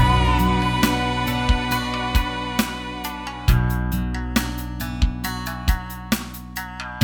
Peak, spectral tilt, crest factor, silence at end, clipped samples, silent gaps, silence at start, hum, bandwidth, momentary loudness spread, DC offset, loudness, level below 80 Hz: -4 dBFS; -5 dB/octave; 18 dB; 0 s; under 0.1%; none; 0 s; none; 19.5 kHz; 10 LU; under 0.1%; -23 LUFS; -26 dBFS